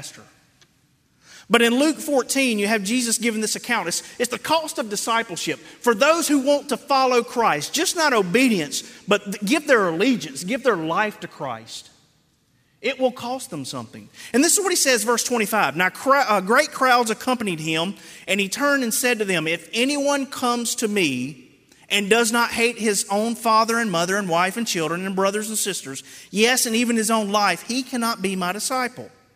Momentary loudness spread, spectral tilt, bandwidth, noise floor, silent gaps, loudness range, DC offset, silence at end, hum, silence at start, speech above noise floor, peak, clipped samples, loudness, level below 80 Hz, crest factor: 11 LU; -2.5 dB/octave; 16 kHz; -63 dBFS; none; 4 LU; under 0.1%; 0.3 s; none; 0 s; 41 dB; -2 dBFS; under 0.1%; -20 LUFS; -68 dBFS; 20 dB